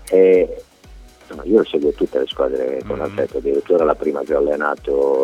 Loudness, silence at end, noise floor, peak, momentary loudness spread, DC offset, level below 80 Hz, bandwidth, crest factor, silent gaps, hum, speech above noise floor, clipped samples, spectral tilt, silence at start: -18 LUFS; 0 s; -42 dBFS; 0 dBFS; 10 LU; under 0.1%; -42 dBFS; 12 kHz; 18 dB; none; none; 25 dB; under 0.1%; -6 dB/octave; 0 s